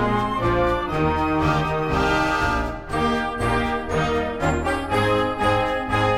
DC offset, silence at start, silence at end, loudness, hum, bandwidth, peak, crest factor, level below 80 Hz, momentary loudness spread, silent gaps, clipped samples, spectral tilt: under 0.1%; 0 s; 0 s; -22 LUFS; none; 16 kHz; -8 dBFS; 14 dB; -34 dBFS; 3 LU; none; under 0.1%; -6 dB/octave